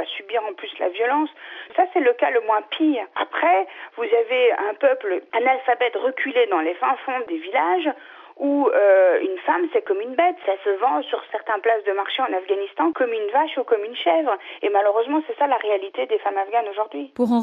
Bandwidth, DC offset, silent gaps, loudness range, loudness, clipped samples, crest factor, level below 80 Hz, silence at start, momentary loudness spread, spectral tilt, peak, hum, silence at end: 4.5 kHz; under 0.1%; none; 2 LU; -21 LUFS; under 0.1%; 14 dB; -82 dBFS; 0 s; 8 LU; -6 dB/octave; -6 dBFS; none; 0 s